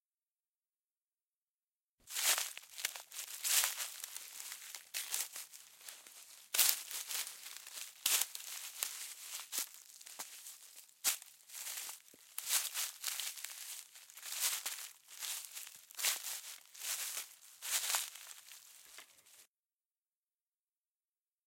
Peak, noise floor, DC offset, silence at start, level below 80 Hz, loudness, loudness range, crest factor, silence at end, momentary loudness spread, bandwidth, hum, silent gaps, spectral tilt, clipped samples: -6 dBFS; under -90 dBFS; under 0.1%; 2.05 s; under -90 dBFS; -38 LUFS; 6 LU; 36 dB; 2.05 s; 19 LU; 17 kHz; none; none; 4.5 dB/octave; under 0.1%